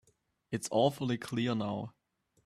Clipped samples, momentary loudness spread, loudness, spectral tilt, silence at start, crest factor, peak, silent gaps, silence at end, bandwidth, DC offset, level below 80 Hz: under 0.1%; 11 LU; -33 LUFS; -5.5 dB/octave; 0.5 s; 20 dB; -16 dBFS; none; 0.55 s; 14.5 kHz; under 0.1%; -70 dBFS